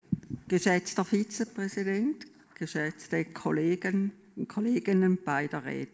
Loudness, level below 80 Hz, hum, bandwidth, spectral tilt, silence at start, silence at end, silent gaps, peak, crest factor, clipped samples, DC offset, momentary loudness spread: -30 LUFS; -66 dBFS; none; 8 kHz; -6 dB/octave; 0.1 s; 0.05 s; none; -12 dBFS; 18 dB; under 0.1%; under 0.1%; 10 LU